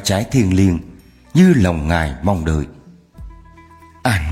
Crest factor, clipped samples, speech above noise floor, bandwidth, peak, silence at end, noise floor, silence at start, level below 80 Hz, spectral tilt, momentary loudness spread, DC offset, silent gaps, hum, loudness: 16 dB; under 0.1%; 29 dB; 14.5 kHz; -2 dBFS; 0 s; -43 dBFS; 0 s; -32 dBFS; -6 dB/octave; 11 LU; under 0.1%; none; none; -16 LUFS